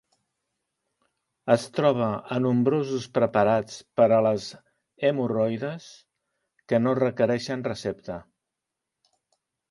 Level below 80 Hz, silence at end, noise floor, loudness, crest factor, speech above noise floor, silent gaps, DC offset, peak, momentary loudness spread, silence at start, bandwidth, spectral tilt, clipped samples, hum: -64 dBFS; 1.5 s; -85 dBFS; -25 LUFS; 20 dB; 61 dB; none; under 0.1%; -6 dBFS; 13 LU; 1.45 s; 11.5 kHz; -6.5 dB/octave; under 0.1%; none